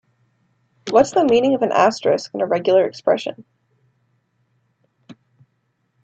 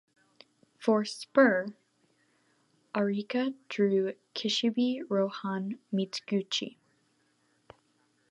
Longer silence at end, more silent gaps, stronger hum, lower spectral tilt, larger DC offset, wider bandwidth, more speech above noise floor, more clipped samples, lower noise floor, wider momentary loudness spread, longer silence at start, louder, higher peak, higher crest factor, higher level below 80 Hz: second, 0.9 s vs 1.6 s; neither; neither; about the same, -5 dB/octave vs -5 dB/octave; neither; second, 8.6 kHz vs 11.5 kHz; first, 52 dB vs 42 dB; neither; about the same, -69 dBFS vs -71 dBFS; second, 6 LU vs 10 LU; about the same, 0.85 s vs 0.8 s; first, -17 LUFS vs -30 LUFS; first, -2 dBFS vs -10 dBFS; about the same, 20 dB vs 22 dB; first, -62 dBFS vs -82 dBFS